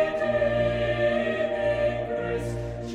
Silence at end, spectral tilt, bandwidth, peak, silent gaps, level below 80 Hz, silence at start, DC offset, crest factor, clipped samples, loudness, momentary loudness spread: 0 s; -6.5 dB/octave; 11 kHz; -12 dBFS; none; -42 dBFS; 0 s; under 0.1%; 14 dB; under 0.1%; -26 LUFS; 6 LU